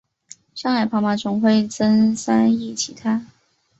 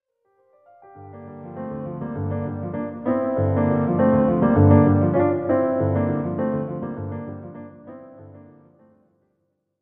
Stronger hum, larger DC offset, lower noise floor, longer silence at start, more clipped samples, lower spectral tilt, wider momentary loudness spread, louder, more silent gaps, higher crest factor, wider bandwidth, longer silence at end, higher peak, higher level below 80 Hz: neither; neither; second, -48 dBFS vs -73 dBFS; second, 0.55 s vs 0.95 s; neither; second, -5 dB/octave vs -13.5 dB/octave; second, 9 LU vs 23 LU; about the same, -19 LUFS vs -21 LUFS; neither; about the same, 16 dB vs 20 dB; first, 8.2 kHz vs 3.3 kHz; second, 0.55 s vs 1.4 s; about the same, -4 dBFS vs -2 dBFS; second, -60 dBFS vs -52 dBFS